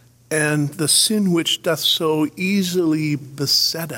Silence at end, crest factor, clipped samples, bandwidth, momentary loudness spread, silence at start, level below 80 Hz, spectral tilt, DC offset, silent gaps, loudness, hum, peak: 0 s; 16 dB; under 0.1%; 16.5 kHz; 7 LU; 0.3 s; -64 dBFS; -3.5 dB/octave; under 0.1%; none; -18 LUFS; none; -4 dBFS